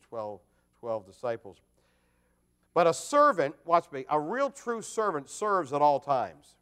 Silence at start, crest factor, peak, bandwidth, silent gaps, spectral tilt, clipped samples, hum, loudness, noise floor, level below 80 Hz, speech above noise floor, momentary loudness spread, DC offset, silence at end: 0.1 s; 20 dB; -10 dBFS; 14.5 kHz; none; -4.5 dB/octave; under 0.1%; 60 Hz at -65 dBFS; -28 LUFS; -71 dBFS; -74 dBFS; 42 dB; 15 LU; under 0.1%; 0.3 s